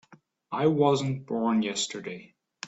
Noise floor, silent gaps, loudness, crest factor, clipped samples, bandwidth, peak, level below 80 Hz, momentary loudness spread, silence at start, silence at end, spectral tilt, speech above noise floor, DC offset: -53 dBFS; none; -27 LUFS; 20 dB; under 0.1%; 8.2 kHz; -10 dBFS; -70 dBFS; 15 LU; 0.1 s; 0 s; -5 dB/octave; 26 dB; under 0.1%